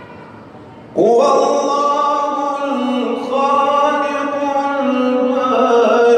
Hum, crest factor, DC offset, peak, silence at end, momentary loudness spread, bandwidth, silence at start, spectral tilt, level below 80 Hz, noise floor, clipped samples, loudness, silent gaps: none; 12 dB; under 0.1%; -4 dBFS; 0 s; 7 LU; 9.4 kHz; 0 s; -4.5 dB/octave; -66 dBFS; -36 dBFS; under 0.1%; -15 LUFS; none